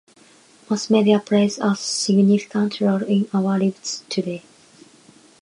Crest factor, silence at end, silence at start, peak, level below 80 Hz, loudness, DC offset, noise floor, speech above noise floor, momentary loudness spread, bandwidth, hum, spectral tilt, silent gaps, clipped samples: 18 dB; 1.05 s; 0.7 s; -4 dBFS; -70 dBFS; -20 LUFS; under 0.1%; -52 dBFS; 32 dB; 9 LU; 11 kHz; none; -5.5 dB/octave; none; under 0.1%